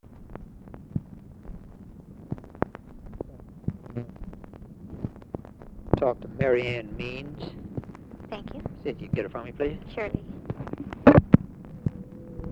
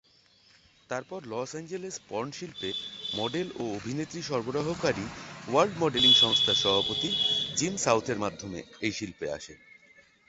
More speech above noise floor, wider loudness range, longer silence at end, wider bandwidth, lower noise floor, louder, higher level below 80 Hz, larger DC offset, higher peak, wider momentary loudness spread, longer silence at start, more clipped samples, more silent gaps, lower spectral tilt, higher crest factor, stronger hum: second, 16 dB vs 33 dB; first, 14 LU vs 11 LU; second, 0 s vs 0.7 s; second, 7.6 kHz vs 8.4 kHz; second, -46 dBFS vs -62 dBFS; about the same, -28 LUFS vs -27 LUFS; first, -44 dBFS vs -60 dBFS; neither; first, 0 dBFS vs -8 dBFS; first, 23 LU vs 16 LU; second, 0.05 s vs 0.9 s; neither; neither; first, -9.5 dB/octave vs -3 dB/octave; first, 28 dB vs 22 dB; neither